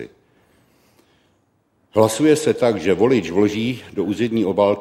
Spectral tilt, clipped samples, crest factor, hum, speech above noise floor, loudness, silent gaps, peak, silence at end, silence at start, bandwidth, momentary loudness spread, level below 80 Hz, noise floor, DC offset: -5.5 dB/octave; under 0.1%; 18 dB; none; 46 dB; -18 LUFS; none; -2 dBFS; 0 s; 0 s; 15.5 kHz; 8 LU; -56 dBFS; -63 dBFS; under 0.1%